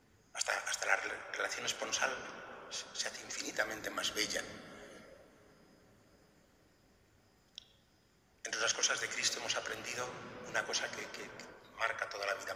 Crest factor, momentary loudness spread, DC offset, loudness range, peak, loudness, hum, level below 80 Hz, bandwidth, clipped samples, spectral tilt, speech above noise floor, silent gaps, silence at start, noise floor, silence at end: 26 dB; 19 LU; under 0.1%; 8 LU; -14 dBFS; -37 LUFS; none; -74 dBFS; 15.5 kHz; under 0.1%; 0 dB/octave; 30 dB; none; 0.35 s; -70 dBFS; 0 s